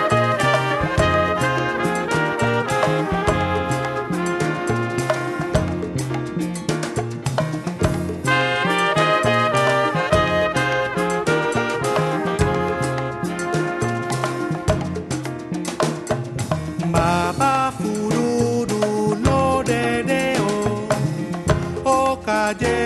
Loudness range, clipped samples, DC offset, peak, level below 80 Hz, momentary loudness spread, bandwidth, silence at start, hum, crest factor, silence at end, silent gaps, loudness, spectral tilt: 5 LU; under 0.1%; under 0.1%; -4 dBFS; -40 dBFS; 7 LU; 13 kHz; 0 s; none; 18 dB; 0 s; none; -20 LUFS; -5.5 dB/octave